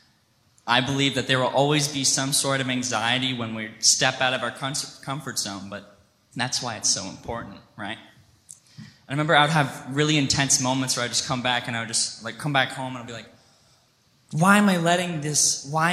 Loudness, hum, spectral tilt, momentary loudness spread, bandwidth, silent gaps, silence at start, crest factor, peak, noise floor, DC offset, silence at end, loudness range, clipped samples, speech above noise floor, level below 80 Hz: -22 LUFS; none; -3 dB/octave; 16 LU; 15.5 kHz; none; 0.65 s; 22 dB; -2 dBFS; -63 dBFS; under 0.1%; 0 s; 7 LU; under 0.1%; 39 dB; -58 dBFS